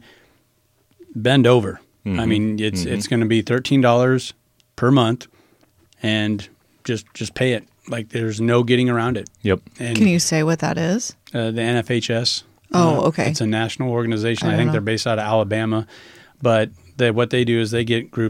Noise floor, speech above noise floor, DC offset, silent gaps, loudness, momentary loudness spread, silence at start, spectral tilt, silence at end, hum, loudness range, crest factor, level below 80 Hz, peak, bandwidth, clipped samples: -62 dBFS; 44 dB; under 0.1%; none; -19 LUFS; 11 LU; 1.1 s; -5.5 dB/octave; 0 s; none; 3 LU; 20 dB; -52 dBFS; 0 dBFS; 15 kHz; under 0.1%